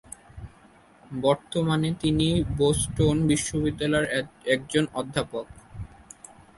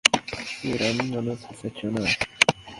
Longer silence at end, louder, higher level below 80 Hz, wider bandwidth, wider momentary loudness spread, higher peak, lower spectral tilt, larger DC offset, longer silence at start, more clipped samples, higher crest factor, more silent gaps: first, 0.7 s vs 0 s; about the same, -25 LUFS vs -25 LUFS; first, -44 dBFS vs -54 dBFS; second, 11.5 kHz vs 16 kHz; first, 20 LU vs 12 LU; second, -8 dBFS vs 0 dBFS; first, -5 dB/octave vs -3 dB/octave; neither; first, 0.35 s vs 0.05 s; neither; second, 18 dB vs 26 dB; neither